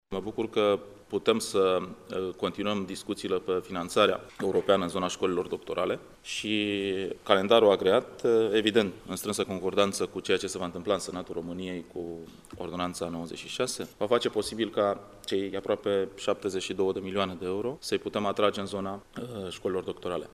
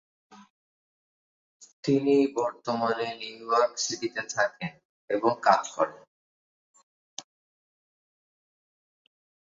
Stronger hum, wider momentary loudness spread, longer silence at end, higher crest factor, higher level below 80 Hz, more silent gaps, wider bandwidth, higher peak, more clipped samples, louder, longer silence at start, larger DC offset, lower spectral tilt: neither; second, 11 LU vs 15 LU; second, 0.05 s vs 2.3 s; about the same, 24 dB vs 26 dB; first, -62 dBFS vs -76 dBFS; second, none vs 0.50-1.60 s, 1.73-1.83 s, 4.85-5.08 s, 6.07-6.74 s, 6.83-7.17 s; first, 15.5 kHz vs 7.8 kHz; about the same, -4 dBFS vs -4 dBFS; neither; about the same, -29 LUFS vs -27 LUFS; second, 0.1 s vs 0.3 s; neither; about the same, -4.5 dB/octave vs -4 dB/octave